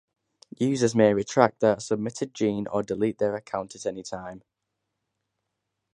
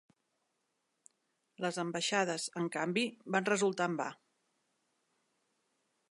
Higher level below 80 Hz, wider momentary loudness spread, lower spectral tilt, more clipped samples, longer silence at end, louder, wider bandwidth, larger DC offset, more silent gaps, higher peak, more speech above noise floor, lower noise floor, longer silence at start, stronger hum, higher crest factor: first, -64 dBFS vs -88 dBFS; first, 13 LU vs 7 LU; first, -5.5 dB/octave vs -3.5 dB/octave; neither; second, 1.55 s vs 1.95 s; first, -25 LUFS vs -34 LUFS; about the same, 11 kHz vs 11.5 kHz; neither; neither; first, -2 dBFS vs -16 dBFS; first, 57 dB vs 48 dB; about the same, -82 dBFS vs -82 dBFS; second, 0.6 s vs 1.6 s; neither; about the same, 26 dB vs 22 dB